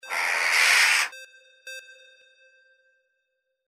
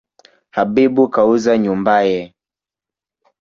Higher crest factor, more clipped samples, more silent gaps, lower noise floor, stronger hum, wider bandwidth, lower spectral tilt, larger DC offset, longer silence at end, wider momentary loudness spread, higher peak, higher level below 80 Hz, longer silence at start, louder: first, 24 dB vs 14 dB; neither; neither; second, -78 dBFS vs -89 dBFS; neither; first, 16 kHz vs 7.6 kHz; second, 4.5 dB/octave vs -6.5 dB/octave; neither; first, 1.85 s vs 1.15 s; first, 24 LU vs 10 LU; about the same, -4 dBFS vs -2 dBFS; second, -88 dBFS vs -56 dBFS; second, 0.05 s vs 0.55 s; second, -20 LUFS vs -15 LUFS